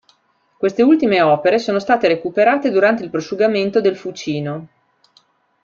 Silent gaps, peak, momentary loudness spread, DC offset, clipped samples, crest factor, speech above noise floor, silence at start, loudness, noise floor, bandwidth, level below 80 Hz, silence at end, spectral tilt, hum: none; -2 dBFS; 10 LU; under 0.1%; under 0.1%; 16 dB; 45 dB; 0.6 s; -16 LUFS; -60 dBFS; 7.4 kHz; -60 dBFS; 0.95 s; -6 dB/octave; none